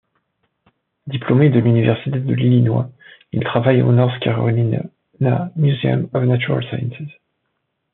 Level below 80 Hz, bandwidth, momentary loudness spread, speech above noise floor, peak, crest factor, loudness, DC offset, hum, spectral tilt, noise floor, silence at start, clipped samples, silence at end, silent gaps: -56 dBFS; 4 kHz; 14 LU; 56 dB; -2 dBFS; 16 dB; -17 LUFS; under 0.1%; none; -7.5 dB/octave; -72 dBFS; 1.05 s; under 0.1%; 0.85 s; none